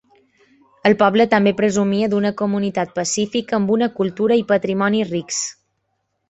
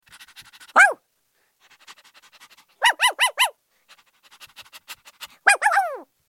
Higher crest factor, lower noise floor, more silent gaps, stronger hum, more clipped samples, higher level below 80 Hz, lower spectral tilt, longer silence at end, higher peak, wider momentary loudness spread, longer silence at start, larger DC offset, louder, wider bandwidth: second, 18 dB vs 24 dB; first, -72 dBFS vs -68 dBFS; neither; neither; neither; first, -58 dBFS vs -80 dBFS; first, -4.5 dB/octave vs 2.5 dB/octave; first, 0.8 s vs 0.25 s; about the same, -2 dBFS vs 0 dBFS; second, 7 LU vs 25 LU; first, 0.85 s vs 0.4 s; neither; about the same, -18 LUFS vs -19 LUFS; second, 8.2 kHz vs 17 kHz